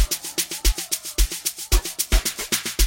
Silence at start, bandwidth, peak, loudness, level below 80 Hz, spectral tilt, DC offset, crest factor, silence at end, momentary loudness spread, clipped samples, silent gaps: 0 s; 16.5 kHz; -2 dBFS; -23 LUFS; -26 dBFS; -2 dB/octave; under 0.1%; 20 dB; 0 s; 3 LU; under 0.1%; none